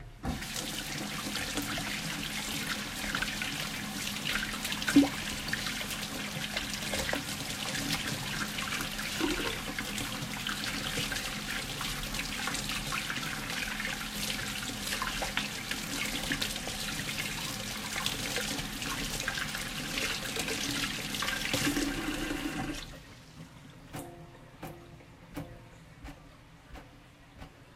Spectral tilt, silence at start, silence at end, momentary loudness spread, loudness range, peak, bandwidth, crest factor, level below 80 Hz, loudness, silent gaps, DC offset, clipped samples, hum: -2.5 dB/octave; 0 s; 0 s; 16 LU; 10 LU; -10 dBFS; 16 kHz; 24 dB; -50 dBFS; -33 LUFS; none; under 0.1%; under 0.1%; none